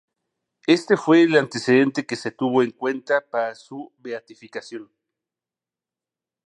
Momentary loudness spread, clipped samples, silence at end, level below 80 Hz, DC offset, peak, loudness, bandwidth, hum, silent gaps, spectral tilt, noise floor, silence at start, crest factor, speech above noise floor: 20 LU; under 0.1%; 1.65 s; -76 dBFS; under 0.1%; -2 dBFS; -20 LUFS; 10 kHz; none; none; -5.5 dB/octave; under -90 dBFS; 0.7 s; 20 dB; over 69 dB